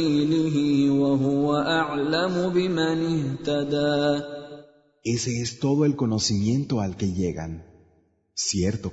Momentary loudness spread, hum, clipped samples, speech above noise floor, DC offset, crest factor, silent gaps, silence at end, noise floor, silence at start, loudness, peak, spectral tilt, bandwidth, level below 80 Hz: 8 LU; none; under 0.1%; 40 dB; under 0.1%; 14 dB; none; 0 s; -63 dBFS; 0 s; -24 LUFS; -10 dBFS; -5.5 dB/octave; 8 kHz; -52 dBFS